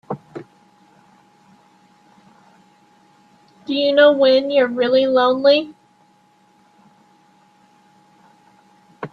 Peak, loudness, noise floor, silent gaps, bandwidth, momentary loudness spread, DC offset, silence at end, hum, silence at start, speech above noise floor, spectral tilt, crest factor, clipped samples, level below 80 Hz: -2 dBFS; -15 LUFS; -56 dBFS; none; 6.2 kHz; 24 LU; under 0.1%; 0.05 s; none; 0.1 s; 41 dB; -6 dB/octave; 20 dB; under 0.1%; -70 dBFS